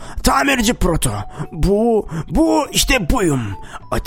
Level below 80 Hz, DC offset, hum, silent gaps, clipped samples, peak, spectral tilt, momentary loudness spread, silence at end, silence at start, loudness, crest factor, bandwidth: -26 dBFS; under 0.1%; none; none; under 0.1%; 0 dBFS; -4 dB/octave; 11 LU; 0 s; 0 s; -17 LUFS; 16 dB; 16.5 kHz